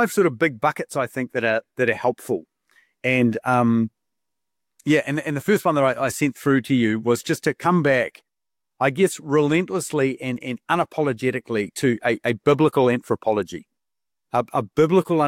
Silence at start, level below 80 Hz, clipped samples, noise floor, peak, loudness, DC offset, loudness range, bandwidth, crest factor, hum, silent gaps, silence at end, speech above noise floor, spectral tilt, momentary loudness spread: 0 s; -64 dBFS; under 0.1%; -89 dBFS; -6 dBFS; -22 LUFS; under 0.1%; 2 LU; 16.5 kHz; 16 dB; none; none; 0 s; 68 dB; -6 dB/octave; 8 LU